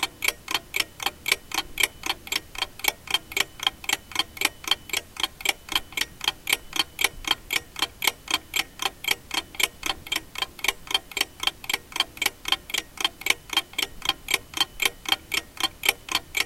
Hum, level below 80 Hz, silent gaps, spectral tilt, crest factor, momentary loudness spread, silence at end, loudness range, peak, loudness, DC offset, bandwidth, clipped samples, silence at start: none; -50 dBFS; none; 0.5 dB/octave; 28 dB; 6 LU; 0 s; 1 LU; -2 dBFS; -26 LUFS; under 0.1%; 17 kHz; under 0.1%; 0 s